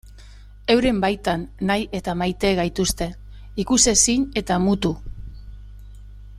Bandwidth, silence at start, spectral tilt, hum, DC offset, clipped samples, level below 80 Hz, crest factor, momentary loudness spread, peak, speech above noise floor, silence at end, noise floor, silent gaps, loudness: 15.5 kHz; 0.05 s; -3.5 dB/octave; 50 Hz at -40 dBFS; under 0.1%; under 0.1%; -38 dBFS; 20 dB; 15 LU; -2 dBFS; 22 dB; 0 s; -42 dBFS; none; -20 LUFS